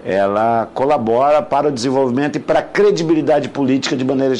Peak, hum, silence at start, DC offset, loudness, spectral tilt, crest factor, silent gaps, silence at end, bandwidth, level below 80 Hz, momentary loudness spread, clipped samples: -6 dBFS; none; 0 s; under 0.1%; -16 LUFS; -6 dB/octave; 10 dB; none; 0 s; 11 kHz; -52 dBFS; 4 LU; under 0.1%